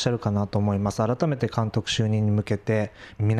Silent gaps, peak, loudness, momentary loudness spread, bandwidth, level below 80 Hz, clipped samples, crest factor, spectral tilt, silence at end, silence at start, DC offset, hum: none; -8 dBFS; -25 LUFS; 3 LU; 11 kHz; -52 dBFS; under 0.1%; 16 dB; -6.5 dB/octave; 0 s; 0 s; under 0.1%; none